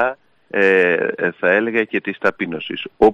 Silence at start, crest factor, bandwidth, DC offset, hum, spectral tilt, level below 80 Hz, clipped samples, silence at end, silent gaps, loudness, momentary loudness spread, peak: 0 s; 16 dB; 7.2 kHz; under 0.1%; none; -6.5 dB/octave; -52 dBFS; under 0.1%; 0 s; none; -18 LUFS; 11 LU; -2 dBFS